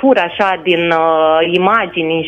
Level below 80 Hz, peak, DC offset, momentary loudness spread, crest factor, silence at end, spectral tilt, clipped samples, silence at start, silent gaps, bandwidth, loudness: -52 dBFS; 0 dBFS; under 0.1%; 3 LU; 12 dB; 0 s; -6.5 dB/octave; under 0.1%; 0 s; none; 8.2 kHz; -12 LUFS